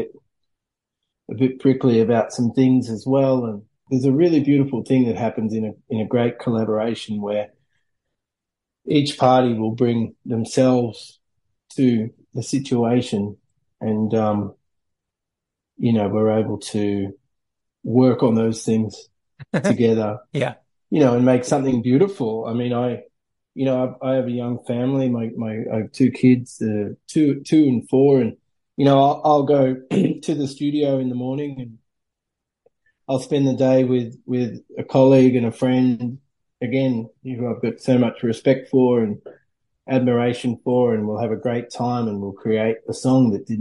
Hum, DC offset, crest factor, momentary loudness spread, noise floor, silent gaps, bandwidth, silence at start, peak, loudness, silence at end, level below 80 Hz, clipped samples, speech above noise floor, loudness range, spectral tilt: none; under 0.1%; 18 dB; 11 LU; -85 dBFS; none; 11.5 kHz; 0 s; -2 dBFS; -20 LUFS; 0 s; -62 dBFS; under 0.1%; 66 dB; 5 LU; -7.5 dB/octave